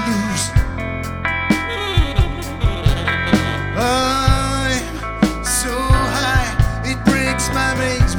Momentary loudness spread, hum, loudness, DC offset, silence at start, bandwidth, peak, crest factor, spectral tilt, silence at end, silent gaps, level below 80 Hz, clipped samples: 5 LU; none; -18 LUFS; under 0.1%; 0 s; 20 kHz; 0 dBFS; 16 dB; -4.5 dB/octave; 0 s; none; -24 dBFS; under 0.1%